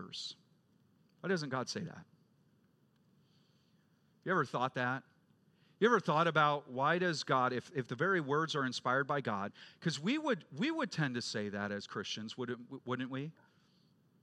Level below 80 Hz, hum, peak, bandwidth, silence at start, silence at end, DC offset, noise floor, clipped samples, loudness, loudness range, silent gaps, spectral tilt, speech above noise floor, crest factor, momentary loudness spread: -88 dBFS; none; -14 dBFS; 11 kHz; 0 s; 0.9 s; under 0.1%; -71 dBFS; under 0.1%; -35 LUFS; 10 LU; none; -5 dB/octave; 36 dB; 22 dB; 13 LU